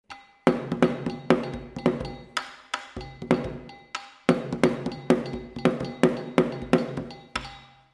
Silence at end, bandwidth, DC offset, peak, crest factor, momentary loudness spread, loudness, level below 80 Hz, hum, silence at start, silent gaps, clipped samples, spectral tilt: 0.25 s; 12 kHz; under 0.1%; 0 dBFS; 26 dB; 12 LU; -27 LUFS; -50 dBFS; none; 0.1 s; none; under 0.1%; -6.5 dB/octave